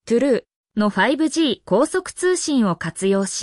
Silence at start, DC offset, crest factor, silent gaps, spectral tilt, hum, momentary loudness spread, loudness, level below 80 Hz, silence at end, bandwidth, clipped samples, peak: 0.05 s; under 0.1%; 14 dB; 0.56-0.64 s; -4.5 dB/octave; none; 4 LU; -20 LUFS; -58 dBFS; 0 s; 12 kHz; under 0.1%; -6 dBFS